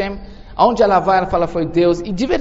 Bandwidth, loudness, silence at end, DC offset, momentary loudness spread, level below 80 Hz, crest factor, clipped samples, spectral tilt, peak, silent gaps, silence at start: 8 kHz; -16 LUFS; 0 s; under 0.1%; 12 LU; -36 dBFS; 16 dB; under 0.1%; -5 dB/octave; 0 dBFS; none; 0 s